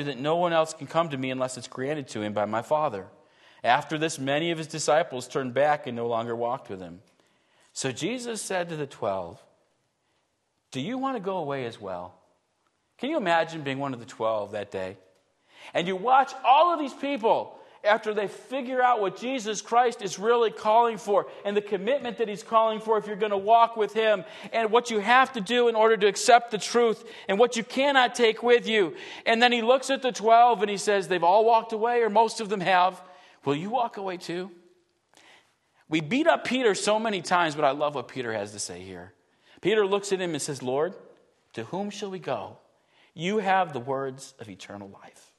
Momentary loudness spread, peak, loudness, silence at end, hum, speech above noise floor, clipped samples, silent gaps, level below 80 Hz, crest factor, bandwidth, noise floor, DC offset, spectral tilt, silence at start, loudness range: 14 LU; -4 dBFS; -25 LUFS; 0.3 s; none; 49 dB; under 0.1%; none; -76 dBFS; 22 dB; 12.5 kHz; -74 dBFS; under 0.1%; -4 dB/octave; 0 s; 11 LU